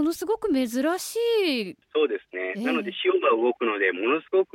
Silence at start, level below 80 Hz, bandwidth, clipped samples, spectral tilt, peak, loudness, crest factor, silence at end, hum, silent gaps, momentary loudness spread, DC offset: 0 s; -66 dBFS; 17 kHz; under 0.1%; -3.5 dB/octave; -10 dBFS; -25 LUFS; 14 dB; 0.1 s; none; none; 6 LU; under 0.1%